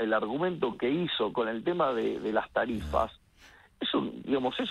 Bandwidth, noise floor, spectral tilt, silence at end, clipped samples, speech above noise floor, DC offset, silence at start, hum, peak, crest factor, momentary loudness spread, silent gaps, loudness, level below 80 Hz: 12 kHz; -57 dBFS; -6.5 dB/octave; 0 s; under 0.1%; 28 dB; under 0.1%; 0 s; none; -12 dBFS; 18 dB; 3 LU; none; -30 LUFS; -52 dBFS